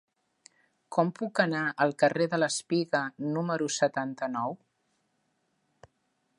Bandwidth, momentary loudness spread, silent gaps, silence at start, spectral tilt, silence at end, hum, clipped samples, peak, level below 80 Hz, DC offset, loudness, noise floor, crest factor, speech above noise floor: 11.5 kHz; 7 LU; none; 0.9 s; -4.5 dB/octave; 1.85 s; none; under 0.1%; -10 dBFS; -80 dBFS; under 0.1%; -29 LUFS; -76 dBFS; 22 dB; 47 dB